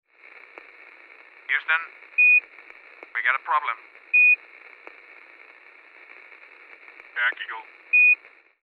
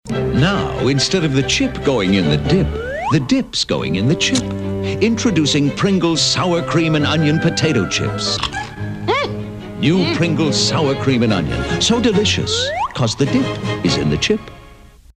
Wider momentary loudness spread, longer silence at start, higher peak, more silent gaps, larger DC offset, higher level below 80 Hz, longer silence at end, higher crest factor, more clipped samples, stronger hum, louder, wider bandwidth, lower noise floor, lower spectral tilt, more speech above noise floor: first, 19 LU vs 6 LU; first, 1.5 s vs 0.05 s; second, -6 dBFS vs -2 dBFS; neither; neither; second, -90 dBFS vs -36 dBFS; about the same, 0.5 s vs 0.45 s; first, 20 dB vs 14 dB; neither; neither; second, -19 LUFS vs -16 LUFS; second, 4.7 kHz vs 12 kHz; first, -50 dBFS vs -42 dBFS; second, -0.5 dB/octave vs -5 dB/octave; about the same, 25 dB vs 26 dB